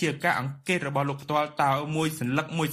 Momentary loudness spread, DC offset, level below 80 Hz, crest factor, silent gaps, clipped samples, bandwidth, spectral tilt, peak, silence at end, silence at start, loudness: 3 LU; under 0.1%; -64 dBFS; 18 dB; none; under 0.1%; 15.5 kHz; -5.5 dB/octave; -8 dBFS; 0 s; 0 s; -27 LUFS